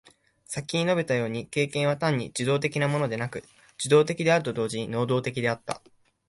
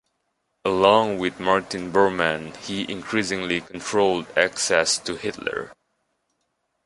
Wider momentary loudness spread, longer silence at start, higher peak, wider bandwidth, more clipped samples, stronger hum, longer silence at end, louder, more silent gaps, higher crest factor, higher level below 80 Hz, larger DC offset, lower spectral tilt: about the same, 12 LU vs 11 LU; second, 0.5 s vs 0.65 s; second, -8 dBFS vs -2 dBFS; about the same, 11.5 kHz vs 11.5 kHz; neither; neither; second, 0.5 s vs 1.15 s; second, -26 LUFS vs -22 LUFS; neither; about the same, 18 dB vs 22 dB; second, -62 dBFS vs -56 dBFS; neither; first, -5 dB/octave vs -3 dB/octave